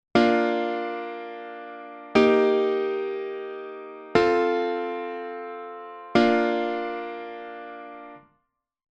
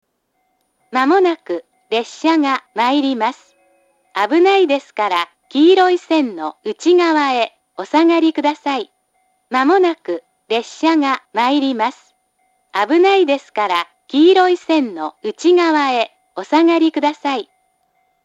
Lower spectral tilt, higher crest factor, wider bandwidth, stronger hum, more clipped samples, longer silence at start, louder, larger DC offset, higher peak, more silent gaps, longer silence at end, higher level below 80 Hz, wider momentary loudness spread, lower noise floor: first, -6 dB/octave vs -3.5 dB/octave; first, 22 dB vs 16 dB; about the same, 8.6 kHz vs 8 kHz; neither; neither; second, 0.15 s vs 0.9 s; second, -24 LUFS vs -16 LUFS; neither; second, -4 dBFS vs 0 dBFS; neither; about the same, 0.75 s vs 0.8 s; first, -60 dBFS vs -76 dBFS; first, 19 LU vs 12 LU; first, -75 dBFS vs -67 dBFS